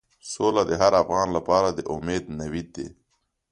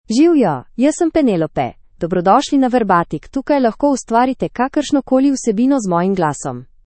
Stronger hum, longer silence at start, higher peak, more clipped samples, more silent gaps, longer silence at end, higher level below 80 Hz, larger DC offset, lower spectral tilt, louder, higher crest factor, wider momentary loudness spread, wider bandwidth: neither; first, 0.25 s vs 0.1 s; second, -4 dBFS vs 0 dBFS; neither; neither; first, 0.6 s vs 0.2 s; about the same, -48 dBFS vs -46 dBFS; neither; about the same, -5 dB/octave vs -6 dB/octave; second, -23 LUFS vs -16 LUFS; first, 22 dB vs 14 dB; first, 17 LU vs 9 LU; first, 11.5 kHz vs 8.8 kHz